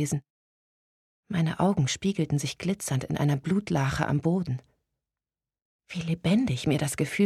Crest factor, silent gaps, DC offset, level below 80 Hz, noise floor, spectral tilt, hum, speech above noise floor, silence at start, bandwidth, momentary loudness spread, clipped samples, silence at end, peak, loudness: 18 dB; 0.30-1.23 s, 5.62-5.79 s; under 0.1%; -54 dBFS; under -90 dBFS; -6 dB/octave; none; over 64 dB; 0 s; 14 kHz; 8 LU; under 0.1%; 0 s; -10 dBFS; -28 LUFS